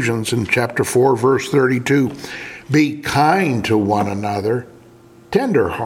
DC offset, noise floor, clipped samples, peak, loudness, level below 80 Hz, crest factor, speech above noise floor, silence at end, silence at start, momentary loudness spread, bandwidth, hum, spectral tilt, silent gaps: under 0.1%; -45 dBFS; under 0.1%; -2 dBFS; -17 LUFS; -50 dBFS; 16 dB; 28 dB; 0 s; 0 s; 7 LU; 16.5 kHz; none; -5.5 dB/octave; none